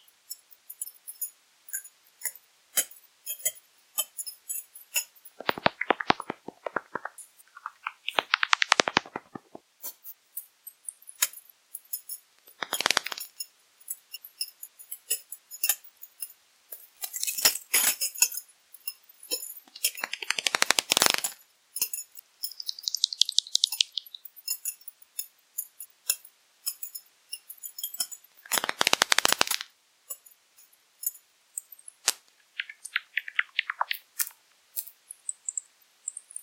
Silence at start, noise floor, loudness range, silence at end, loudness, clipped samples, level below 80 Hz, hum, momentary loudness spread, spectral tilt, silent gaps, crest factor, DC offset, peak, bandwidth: 0.3 s; -60 dBFS; 8 LU; 0 s; -29 LUFS; under 0.1%; -74 dBFS; none; 20 LU; 0.5 dB/octave; none; 32 dB; under 0.1%; 0 dBFS; 17 kHz